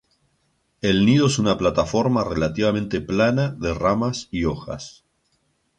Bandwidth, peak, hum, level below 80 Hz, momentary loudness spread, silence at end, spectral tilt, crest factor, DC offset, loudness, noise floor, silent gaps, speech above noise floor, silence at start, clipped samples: 10 kHz; -6 dBFS; none; -42 dBFS; 9 LU; 0.9 s; -6 dB/octave; 16 dB; under 0.1%; -21 LUFS; -68 dBFS; none; 47 dB; 0.85 s; under 0.1%